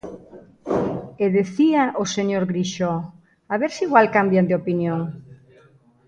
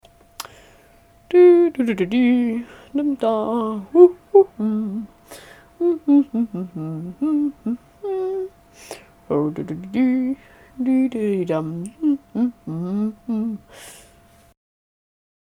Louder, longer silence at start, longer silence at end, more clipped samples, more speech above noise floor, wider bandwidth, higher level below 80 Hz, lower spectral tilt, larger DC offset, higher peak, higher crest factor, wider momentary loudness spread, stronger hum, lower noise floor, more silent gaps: about the same, -21 LUFS vs -20 LUFS; second, 0.05 s vs 0.4 s; second, 0.7 s vs 1.65 s; neither; about the same, 34 dB vs 33 dB; second, 8.8 kHz vs 13 kHz; about the same, -58 dBFS vs -58 dBFS; second, -6 dB/octave vs -7.5 dB/octave; neither; about the same, 0 dBFS vs 0 dBFS; about the same, 22 dB vs 20 dB; second, 16 LU vs 21 LU; neither; about the same, -54 dBFS vs -52 dBFS; neither